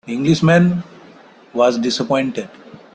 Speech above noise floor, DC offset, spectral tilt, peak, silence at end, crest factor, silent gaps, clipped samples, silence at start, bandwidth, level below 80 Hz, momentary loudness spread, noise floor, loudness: 28 dB; under 0.1%; -6 dB/octave; -2 dBFS; 0.15 s; 16 dB; none; under 0.1%; 0.05 s; 9 kHz; -54 dBFS; 16 LU; -44 dBFS; -16 LUFS